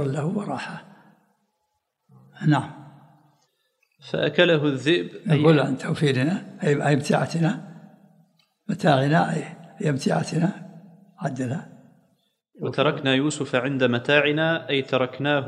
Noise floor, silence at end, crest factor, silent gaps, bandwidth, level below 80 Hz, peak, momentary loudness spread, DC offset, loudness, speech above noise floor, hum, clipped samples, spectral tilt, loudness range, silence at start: -76 dBFS; 0 s; 22 dB; none; 11.5 kHz; -70 dBFS; -2 dBFS; 14 LU; under 0.1%; -23 LUFS; 54 dB; none; under 0.1%; -6 dB/octave; 8 LU; 0 s